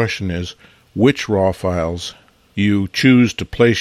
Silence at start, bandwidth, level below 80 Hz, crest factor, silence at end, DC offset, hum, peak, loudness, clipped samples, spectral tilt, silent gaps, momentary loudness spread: 0 s; 13 kHz; -44 dBFS; 16 dB; 0 s; under 0.1%; none; -2 dBFS; -17 LUFS; under 0.1%; -6 dB/octave; none; 17 LU